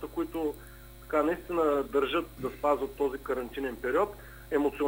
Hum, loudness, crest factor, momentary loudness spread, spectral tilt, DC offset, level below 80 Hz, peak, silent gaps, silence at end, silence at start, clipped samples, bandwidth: none; -31 LUFS; 18 dB; 9 LU; -5.5 dB/octave; under 0.1%; -52 dBFS; -12 dBFS; none; 0 s; 0 s; under 0.1%; 16 kHz